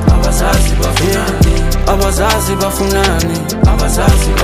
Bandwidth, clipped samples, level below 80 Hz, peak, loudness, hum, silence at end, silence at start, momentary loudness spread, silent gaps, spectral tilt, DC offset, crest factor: 15.5 kHz; under 0.1%; -14 dBFS; 0 dBFS; -12 LUFS; none; 0 s; 0 s; 3 LU; none; -5 dB/octave; under 0.1%; 10 dB